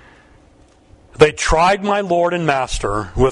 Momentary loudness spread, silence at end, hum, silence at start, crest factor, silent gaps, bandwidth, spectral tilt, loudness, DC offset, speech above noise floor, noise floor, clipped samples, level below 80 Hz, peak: 7 LU; 0 s; none; 1.2 s; 18 dB; none; 11 kHz; -4.5 dB/octave; -16 LUFS; under 0.1%; 34 dB; -49 dBFS; under 0.1%; -30 dBFS; 0 dBFS